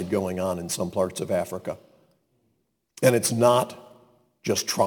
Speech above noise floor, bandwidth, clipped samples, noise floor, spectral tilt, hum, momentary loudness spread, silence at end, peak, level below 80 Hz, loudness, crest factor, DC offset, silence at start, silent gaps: 49 dB; 19 kHz; under 0.1%; -73 dBFS; -4.5 dB/octave; none; 14 LU; 0 s; -6 dBFS; -64 dBFS; -25 LUFS; 20 dB; under 0.1%; 0 s; none